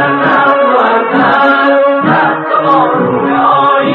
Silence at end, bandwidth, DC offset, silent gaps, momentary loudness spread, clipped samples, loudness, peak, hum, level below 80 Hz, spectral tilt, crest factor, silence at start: 0 s; 5.4 kHz; under 0.1%; none; 3 LU; under 0.1%; -9 LUFS; 0 dBFS; none; -56 dBFS; -8 dB/octave; 8 dB; 0 s